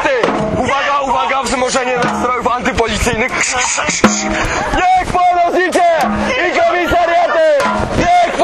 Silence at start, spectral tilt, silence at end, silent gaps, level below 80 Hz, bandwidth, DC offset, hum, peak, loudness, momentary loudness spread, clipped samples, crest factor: 0 s; -3.5 dB/octave; 0 s; none; -30 dBFS; 13.5 kHz; under 0.1%; none; 0 dBFS; -13 LUFS; 3 LU; under 0.1%; 14 dB